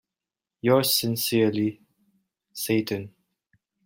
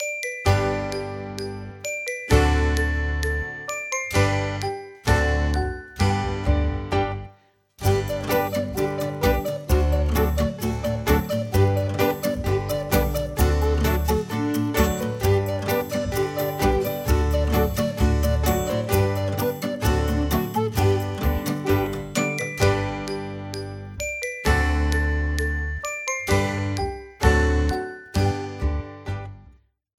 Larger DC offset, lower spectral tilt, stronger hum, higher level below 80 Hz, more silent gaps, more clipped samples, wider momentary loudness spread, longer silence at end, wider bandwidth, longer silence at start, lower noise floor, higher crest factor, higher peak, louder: neither; about the same, -4.5 dB/octave vs -5.5 dB/octave; neither; second, -66 dBFS vs -28 dBFS; neither; neither; first, 13 LU vs 8 LU; first, 0.75 s vs 0.5 s; about the same, 16.5 kHz vs 17 kHz; first, 0.65 s vs 0 s; first, -89 dBFS vs -55 dBFS; about the same, 20 dB vs 20 dB; second, -8 dBFS vs -4 dBFS; about the same, -24 LUFS vs -24 LUFS